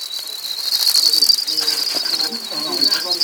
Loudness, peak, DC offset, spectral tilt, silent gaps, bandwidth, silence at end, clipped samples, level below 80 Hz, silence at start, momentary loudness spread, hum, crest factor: -15 LUFS; -2 dBFS; under 0.1%; 1 dB/octave; none; over 20 kHz; 0 s; under 0.1%; -72 dBFS; 0 s; 11 LU; none; 16 dB